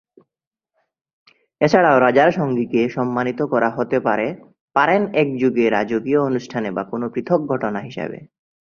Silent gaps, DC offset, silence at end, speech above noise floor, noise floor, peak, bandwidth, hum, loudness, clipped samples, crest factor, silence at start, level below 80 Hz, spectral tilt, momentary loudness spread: 4.61-4.68 s; under 0.1%; 0.4 s; 67 dB; -85 dBFS; 0 dBFS; 7 kHz; none; -19 LUFS; under 0.1%; 18 dB; 1.6 s; -60 dBFS; -7 dB/octave; 11 LU